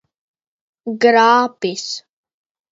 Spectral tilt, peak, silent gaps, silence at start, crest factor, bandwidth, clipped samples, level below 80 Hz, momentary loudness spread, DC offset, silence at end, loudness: -3.5 dB/octave; 0 dBFS; none; 0.85 s; 18 dB; 7.8 kHz; under 0.1%; -72 dBFS; 17 LU; under 0.1%; 0.7 s; -15 LUFS